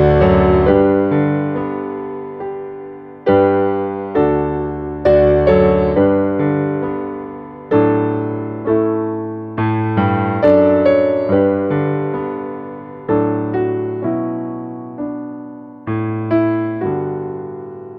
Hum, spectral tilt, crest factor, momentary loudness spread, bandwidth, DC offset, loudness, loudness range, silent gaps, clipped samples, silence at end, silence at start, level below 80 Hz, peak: none; -10.5 dB/octave; 14 dB; 16 LU; 5.4 kHz; under 0.1%; -16 LUFS; 7 LU; none; under 0.1%; 0 s; 0 s; -34 dBFS; -2 dBFS